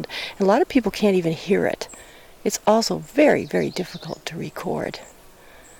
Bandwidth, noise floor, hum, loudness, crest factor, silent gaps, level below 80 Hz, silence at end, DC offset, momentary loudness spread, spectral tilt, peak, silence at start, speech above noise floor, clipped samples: 18.5 kHz; -47 dBFS; none; -22 LUFS; 16 dB; none; -52 dBFS; 0.75 s; under 0.1%; 14 LU; -5 dB/octave; -6 dBFS; 0 s; 25 dB; under 0.1%